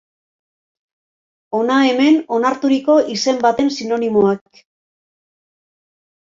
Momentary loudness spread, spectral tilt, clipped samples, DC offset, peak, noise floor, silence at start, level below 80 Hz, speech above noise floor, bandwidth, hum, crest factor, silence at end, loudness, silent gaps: 6 LU; -4.5 dB/octave; under 0.1%; under 0.1%; -2 dBFS; under -90 dBFS; 1.5 s; -60 dBFS; over 75 dB; 7.6 kHz; none; 16 dB; 1.95 s; -16 LUFS; none